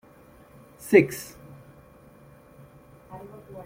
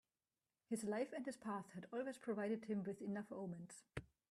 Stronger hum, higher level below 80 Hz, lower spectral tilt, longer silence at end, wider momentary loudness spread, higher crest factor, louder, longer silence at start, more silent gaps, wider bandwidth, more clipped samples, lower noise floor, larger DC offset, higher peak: neither; first, -60 dBFS vs -76 dBFS; about the same, -6 dB/octave vs -6 dB/octave; second, 0.05 s vs 0.25 s; first, 28 LU vs 10 LU; first, 24 dB vs 18 dB; first, -22 LUFS vs -47 LUFS; first, 0.85 s vs 0.7 s; neither; first, 16.5 kHz vs 14 kHz; neither; second, -53 dBFS vs under -90 dBFS; neither; first, -4 dBFS vs -30 dBFS